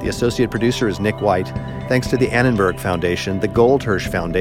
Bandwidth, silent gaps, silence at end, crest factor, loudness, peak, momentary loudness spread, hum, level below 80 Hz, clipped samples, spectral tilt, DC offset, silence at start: 16.5 kHz; none; 0 s; 16 dB; -18 LUFS; -2 dBFS; 5 LU; none; -36 dBFS; under 0.1%; -6 dB/octave; under 0.1%; 0 s